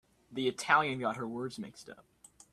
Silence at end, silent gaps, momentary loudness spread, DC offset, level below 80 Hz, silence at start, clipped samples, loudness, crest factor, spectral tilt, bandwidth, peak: 0.55 s; none; 20 LU; under 0.1%; -72 dBFS; 0.3 s; under 0.1%; -32 LUFS; 24 dB; -4 dB/octave; 14 kHz; -10 dBFS